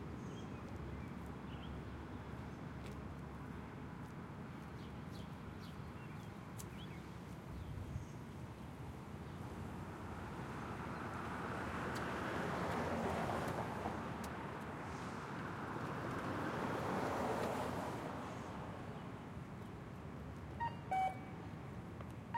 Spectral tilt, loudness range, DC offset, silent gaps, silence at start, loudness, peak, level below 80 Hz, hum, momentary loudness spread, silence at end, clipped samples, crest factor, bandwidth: -6 dB/octave; 8 LU; under 0.1%; none; 0 s; -45 LUFS; -26 dBFS; -60 dBFS; none; 10 LU; 0 s; under 0.1%; 18 dB; 16 kHz